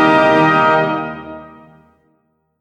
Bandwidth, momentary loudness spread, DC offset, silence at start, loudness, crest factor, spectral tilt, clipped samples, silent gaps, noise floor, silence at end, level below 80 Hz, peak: 9.6 kHz; 22 LU; under 0.1%; 0 s; -13 LUFS; 16 dB; -6.5 dB/octave; under 0.1%; none; -63 dBFS; 1.15 s; -54 dBFS; 0 dBFS